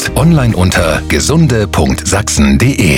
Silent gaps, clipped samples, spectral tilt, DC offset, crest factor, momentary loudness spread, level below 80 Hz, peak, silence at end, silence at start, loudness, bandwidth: none; under 0.1%; -5 dB/octave; under 0.1%; 10 dB; 3 LU; -20 dBFS; 0 dBFS; 0 s; 0 s; -10 LUFS; 17 kHz